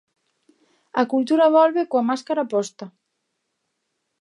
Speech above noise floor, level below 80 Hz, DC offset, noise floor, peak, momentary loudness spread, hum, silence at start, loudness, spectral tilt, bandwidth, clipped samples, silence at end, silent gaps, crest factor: 57 dB; -82 dBFS; under 0.1%; -76 dBFS; -4 dBFS; 16 LU; none; 0.95 s; -20 LUFS; -5 dB/octave; 11 kHz; under 0.1%; 1.3 s; none; 18 dB